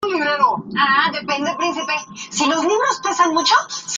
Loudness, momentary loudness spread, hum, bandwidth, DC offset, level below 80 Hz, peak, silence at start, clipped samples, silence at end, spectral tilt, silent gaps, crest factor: -18 LUFS; 7 LU; none; 9.6 kHz; under 0.1%; -64 dBFS; -2 dBFS; 0 s; under 0.1%; 0 s; -2 dB/octave; none; 16 dB